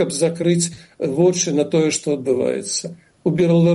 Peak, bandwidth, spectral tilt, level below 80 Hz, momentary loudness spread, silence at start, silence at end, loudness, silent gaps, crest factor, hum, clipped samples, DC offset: -6 dBFS; 11.5 kHz; -5 dB/octave; -60 dBFS; 8 LU; 0 s; 0 s; -19 LUFS; none; 14 dB; none; under 0.1%; under 0.1%